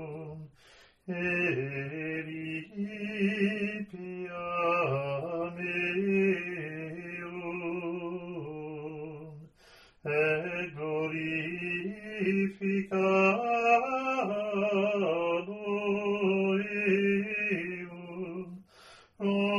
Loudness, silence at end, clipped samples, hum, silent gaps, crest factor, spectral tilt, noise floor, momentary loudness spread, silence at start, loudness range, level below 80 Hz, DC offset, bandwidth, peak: -31 LUFS; 0 s; under 0.1%; none; none; 20 dB; -7 dB/octave; -59 dBFS; 13 LU; 0 s; 7 LU; -70 dBFS; under 0.1%; 10.5 kHz; -12 dBFS